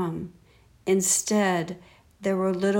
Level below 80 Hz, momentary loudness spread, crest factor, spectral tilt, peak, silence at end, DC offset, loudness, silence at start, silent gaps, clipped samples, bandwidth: -60 dBFS; 16 LU; 16 dB; -4 dB/octave; -10 dBFS; 0 s; under 0.1%; -25 LUFS; 0 s; none; under 0.1%; 17.5 kHz